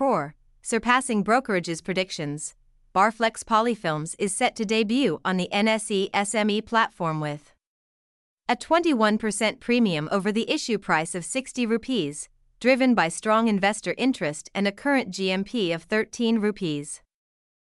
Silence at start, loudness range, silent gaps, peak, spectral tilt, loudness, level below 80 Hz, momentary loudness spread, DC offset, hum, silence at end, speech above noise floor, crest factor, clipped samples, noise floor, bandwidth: 0 s; 2 LU; 7.67-8.37 s; -6 dBFS; -4 dB/octave; -24 LUFS; -60 dBFS; 8 LU; under 0.1%; none; 0.75 s; over 66 dB; 18 dB; under 0.1%; under -90 dBFS; 12 kHz